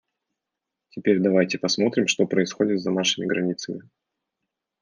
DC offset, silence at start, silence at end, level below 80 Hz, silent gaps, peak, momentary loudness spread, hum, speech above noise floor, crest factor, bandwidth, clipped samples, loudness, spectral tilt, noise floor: under 0.1%; 0.95 s; 1 s; -74 dBFS; none; -6 dBFS; 11 LU; none; 62 dB; 18 dB; 10 kHz; under 0.1%; -23 LUFS; -4.5 dB/octave; -85 dBFS